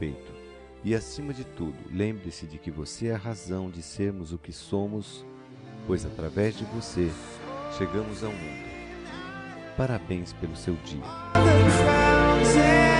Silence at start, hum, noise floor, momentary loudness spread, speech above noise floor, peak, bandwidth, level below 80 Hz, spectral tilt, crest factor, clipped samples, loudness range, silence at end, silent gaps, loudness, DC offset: 0 s; none; -46 dBFS; 20 LU; 20 dB; -6 dBFS; 10.5 kHz; -40 dBFS; -5.5 dB/octave; 20 dB; under 0.1%; 11 LU; 0 s; none; -26 LUFS; under 0.1%